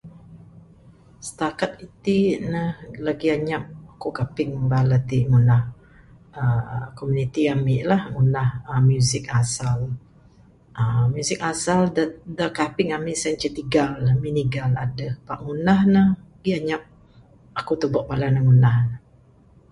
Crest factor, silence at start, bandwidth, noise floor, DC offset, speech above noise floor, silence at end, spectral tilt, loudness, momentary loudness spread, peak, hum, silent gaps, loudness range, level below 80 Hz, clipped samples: 16 dB; 0.05 s; 11.5 kHz; -53 dBFS; under 0.1%; 32 dB; 0.75 s; -6.5 dB/octave; -22 LUFS; 13 LU; -6 dBFS; none; none; 4 LU; -48 dBFS; under 0.1%